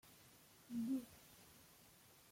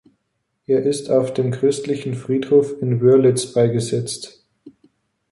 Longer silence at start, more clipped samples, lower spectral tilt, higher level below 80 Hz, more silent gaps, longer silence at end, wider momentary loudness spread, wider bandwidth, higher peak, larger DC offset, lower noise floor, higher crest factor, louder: second, 0.05 s vs 0.7 s; neither; second, -5 dB/octave vs -6.5 dB/octave; second, -82 dBFS vs -60 dBFS; neither; second, 0.1 s vs 0.6 s; first, 21 LU vs 10 LU; first, 16.5 kHz vs 11.5 kHz; second, -34 dBFS vs -4 dBFS; neither; second, -67 dBFS vs -73 dBFS; about the same, 16 dB vs 16 dB; second, -47 LUFS vs -18 LUFS